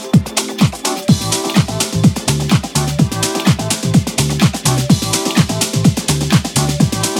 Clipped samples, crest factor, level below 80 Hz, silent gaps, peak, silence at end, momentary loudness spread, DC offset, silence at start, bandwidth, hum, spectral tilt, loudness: under 0.1%; 14 dB; -34 dBFS; none; 0 dBFS; 0 s; 3 LU; under 0.1%; 0 s; 17 kHz; none; -4.5 dB/octave; -15 LUFS